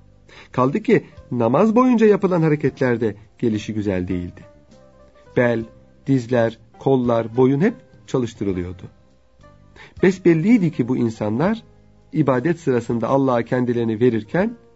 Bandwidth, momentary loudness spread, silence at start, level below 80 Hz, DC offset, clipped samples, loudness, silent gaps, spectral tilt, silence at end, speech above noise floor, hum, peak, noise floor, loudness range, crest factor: 8 kHz; 11 LU; 0.35 s; -52 dBFS; 0.2%; under 0.1%; -19 LUFS; none; -8 dB/octave; 0.2 s; 33 dB; none; -2 dBFS; -52 dBFS; 5 LU; 18 dB